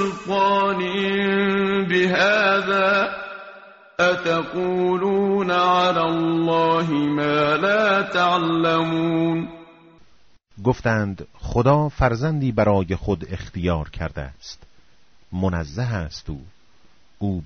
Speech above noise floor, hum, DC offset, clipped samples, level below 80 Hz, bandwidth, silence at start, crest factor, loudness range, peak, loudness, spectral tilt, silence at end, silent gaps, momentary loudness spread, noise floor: 38 dB; none; under 0.1%; under 0.1%; -42 dBFS; 7.6 kHz; 0 s; 18 dB; 9 LU; -4 dBFS; -20 LUFS; -4.5 dB/octave; 0 s; none; 14 LU; -58 dBFS